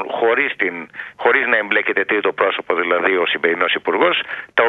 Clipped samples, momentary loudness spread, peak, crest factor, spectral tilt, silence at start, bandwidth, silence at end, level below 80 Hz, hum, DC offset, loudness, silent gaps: under 0.1%; 5 LU; 0 dBFS; 18 dB; -5.5 dB/octave; 0 s; 4.5 kHz; 0 s; -64 dBFS; none; under 0.1%; -17 LUFS; none